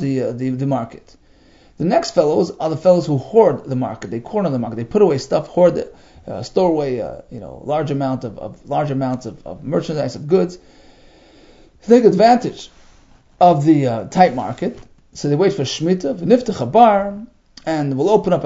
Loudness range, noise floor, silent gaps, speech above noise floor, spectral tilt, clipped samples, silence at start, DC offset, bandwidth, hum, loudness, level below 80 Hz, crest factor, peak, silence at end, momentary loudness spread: 6 LU; -49 dBFS; none; 32 dB; -7 dB/octave; under 0.1%; 0 s; under 0.1%; 7.8 kHz; none; -17 LUFS; -50 dBFS; 18 dB; 0 dBFS; 0 s; 16 LU